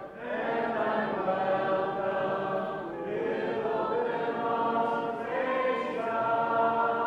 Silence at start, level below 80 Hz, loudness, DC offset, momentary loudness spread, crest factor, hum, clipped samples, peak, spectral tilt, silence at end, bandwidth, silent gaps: 0 s; -68 dBFS; -30 LUFS; under 0.1%; 6 LU; 14 dB; none; under 0.1%; -16 dBFS; -7 dB/octave; 0 s; 8.8 kHz; none